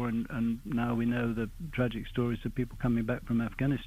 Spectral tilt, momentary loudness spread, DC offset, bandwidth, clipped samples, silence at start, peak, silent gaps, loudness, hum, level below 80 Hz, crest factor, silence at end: -8 dB/octave; 4 LU; under 0.1%; 15 kHz; under 0.1%; 0 s; -18 dBFS; none; -32 LUFS; none; -46 dBFS; 14 dB; 0 s